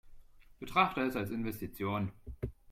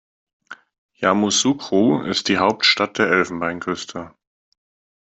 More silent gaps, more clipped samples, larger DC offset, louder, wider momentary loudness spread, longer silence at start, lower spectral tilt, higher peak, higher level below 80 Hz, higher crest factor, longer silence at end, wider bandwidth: second, none vs 0.78-0.89 s; neither; neither; second, -35 LUFS vs -18 LUFS; first, 14 LU vs 11 LU; second, 0.05 s vs 0.5 s; first, -6 dB/octave vs -3 dB/octave; second, -14 dBFS vs -2 dBFS; first, -54 dBFS vs -60 dBFS; about the same, 22 dB vs 20 dB; second, 0.2 s vs 0.95 s; first, 16.5 kHz vs 8.4 kHz